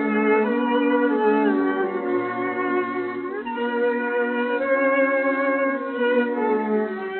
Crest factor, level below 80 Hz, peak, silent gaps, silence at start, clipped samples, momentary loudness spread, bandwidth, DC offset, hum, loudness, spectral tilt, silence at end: 14 dB; -68 dBFS; -8 dBFS; none; 0 s; under 0.1%; 6 LU; 4.3 kHz; under 0.1%; none; -22 LUFS; -3.5 dB/octave; 0 s